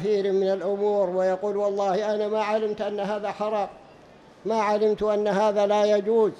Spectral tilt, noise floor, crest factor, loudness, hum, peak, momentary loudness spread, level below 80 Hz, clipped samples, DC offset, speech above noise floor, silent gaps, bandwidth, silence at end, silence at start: -6 dB/octave; -50 dBFS; 12 dB; -24 LUFS; none; -10 dBFS; 7 LU; -62 dBFS; under 0.1%; under 0.1%; 27 dB; none; 9.4 kHz; 0 s; 0 s